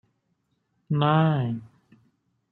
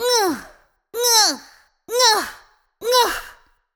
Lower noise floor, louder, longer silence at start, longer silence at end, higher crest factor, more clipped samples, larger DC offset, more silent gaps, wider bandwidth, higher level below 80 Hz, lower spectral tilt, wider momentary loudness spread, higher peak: first, -73 dBFS vs -49 dBFS; second, -24 LUFS vs -17 LUFS; first, 0.9 s vs 0 s; first, 0.85 s vs 0.45 s; about the same, 20 dB vs 18 dB; neither; neither; neither; second, 4.2 kHz vs over 20 kHz; second, -66 dBFS vs -54 dBFS; first, -10 dB/octave vs 1 dB/octave; second, 11 LU vs 18 LU; second, -8 dBFS vs -2 dBFS